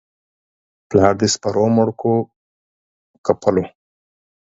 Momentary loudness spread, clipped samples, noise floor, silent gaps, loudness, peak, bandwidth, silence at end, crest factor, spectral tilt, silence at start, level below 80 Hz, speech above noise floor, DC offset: 9 LU; under 0.1%; under -90 dBFS; 2.36-3.24 s; -18 LUFS; 0 dBFS; 8 kHz; 0.8 s; 20 dB; -5.5 dB/octave; 0.9 s; -48 dBFS; over 74 dB; under 0.1%